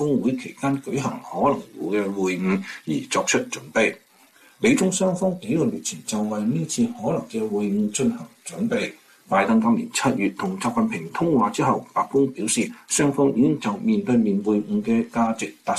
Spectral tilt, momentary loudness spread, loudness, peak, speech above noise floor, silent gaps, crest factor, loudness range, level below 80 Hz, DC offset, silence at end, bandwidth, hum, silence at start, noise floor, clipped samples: -5 dB/octave; 7 LU; -23 LUFS; -8 dBFS; 32 dB; none; 16 dB; 3 LU; -60 dBFS; under 0.1%; 0 s; 14 kHz; none; 0 s; -54 dBFS; under 0.1%